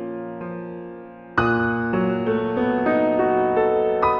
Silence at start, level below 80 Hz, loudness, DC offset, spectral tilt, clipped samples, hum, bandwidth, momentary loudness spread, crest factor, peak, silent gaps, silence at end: 0 s; -50 dBFS; -21 LUFS; under 0.1%; -9 dB/octave; under 0.1%; none; 6.4 kHz; 14 LU; 16 dB; -4 dBFS; none; 0 s